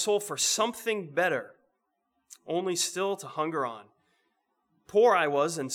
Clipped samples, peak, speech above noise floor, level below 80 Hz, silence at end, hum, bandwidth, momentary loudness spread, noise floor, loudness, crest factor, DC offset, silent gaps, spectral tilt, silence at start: under 0.1%; -12 dBFS; 50 dB; -82 dBFS; 0 s; none; 18 kHz; 11 LU; -78 dBFS; -28 LUFS; 18 dB; under 0.1%; none; -2.5 dB/octave; 0 s